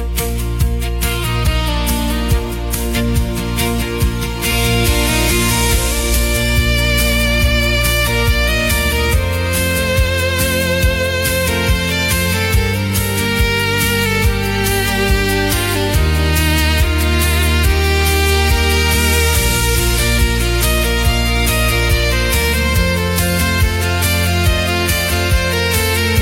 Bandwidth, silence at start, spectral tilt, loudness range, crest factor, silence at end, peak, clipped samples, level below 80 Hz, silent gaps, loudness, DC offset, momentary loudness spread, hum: 16.5 kHz; 0 s; -4 dB/octave; 3 LU; 14 dB; 0 s; 0 dBFS; under 0.1%; -18 dBFS; none; -15 LUFS; under 0.1%; 4 LU; none